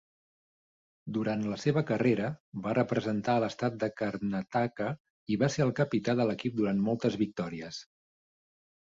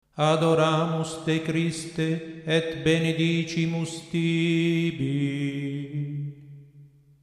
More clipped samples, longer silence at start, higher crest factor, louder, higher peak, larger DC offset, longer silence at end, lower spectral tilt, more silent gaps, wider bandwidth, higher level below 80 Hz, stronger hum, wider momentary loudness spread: neither; first, 1.05 s vs 0.15 s; about the same, 18 dB vs 18 dB; second, -31 LUFS vs -26 LUFS; second, -14 dBFS vs -8 dBFS; neither; first, 1 s vs 0.35 s; about the same, -7 dB/octave vs -6 dB/octave; first, 2.40-2.52 s, 5.00-5.26 s vs none; second, 7.8 kHz vs 11.5 kHz; second, -66 dBFS vs -60 dBFS; neither; about the same, 9 LU vs 10 LU